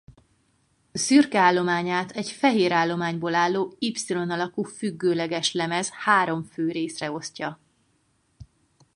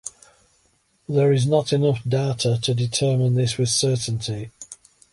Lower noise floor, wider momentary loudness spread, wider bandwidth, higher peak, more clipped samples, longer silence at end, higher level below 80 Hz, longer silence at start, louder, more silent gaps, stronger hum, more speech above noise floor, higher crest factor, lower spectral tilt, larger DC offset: first, -68 dBFS vs -64 dBFS; about the same, 12 LU vs 14 LU; about the same, 11.5 kHz vs 11.5 kHz; about the same, -4 dBFS vs -6 dBFS; neither; about the same, 0.5 s vs 0.4 s; second, -64 dBFS vs -54 dBFS; first, 0.95 s vs 0.05 s; second, -24 LUFS vs -21 LUFS; neither; neither; about the same, 44 dB vs 43 dB; about the same, 20 dB vs 16 dB; about the same, -4 dB/octave vs -5 dB/octave; neither